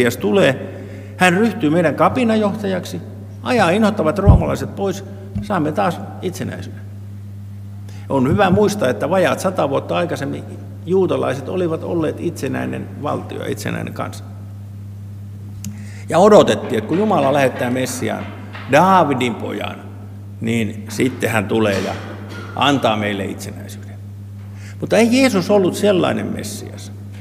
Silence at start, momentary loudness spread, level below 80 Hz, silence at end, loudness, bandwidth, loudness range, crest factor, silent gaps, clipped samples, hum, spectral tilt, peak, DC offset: 0 s; 19 LU; -36 dBFS; 0 s; -17 LUFS; 16 kHz; 7 LU; 18 dB; none; under 0.1%; none; -6 dB/octave; 0 dBFS; under 0.1%